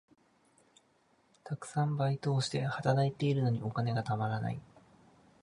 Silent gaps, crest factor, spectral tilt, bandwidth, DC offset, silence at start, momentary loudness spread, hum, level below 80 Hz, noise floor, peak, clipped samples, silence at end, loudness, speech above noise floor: none; 20 dB; -6.5 dB/octave; 11 kHz; under 0.1%; 1.45 s; 9 LU; none; -68 dBFS; -70 dBFS; -14 dBFS; under 0.1%; 0.8 s; -33 LUFS; 38 dB